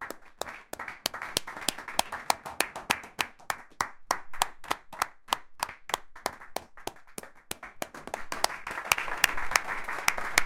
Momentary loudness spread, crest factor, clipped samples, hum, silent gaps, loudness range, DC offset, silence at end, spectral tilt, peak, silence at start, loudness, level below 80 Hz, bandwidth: 13 LU; 32 dB; under 0.1%; none; none; 6 LU; under 0.1%; 0 s; -0.5 dB/octave; 0 dBFS; 0 s; -32 LUFS; -52 dBFS; 17 kHz